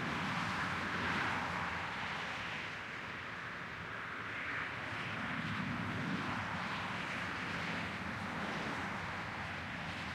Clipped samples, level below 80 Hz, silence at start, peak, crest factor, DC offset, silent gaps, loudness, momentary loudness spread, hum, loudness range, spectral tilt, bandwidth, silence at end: under 0.1%; -64 dBFS; 0 s; -24 dBFS; 16 dB; under 0.1%; none; -39 LUFS; 6 LU; none; 3 LU; -4.5 dB/octave; 16 kHz; 0 s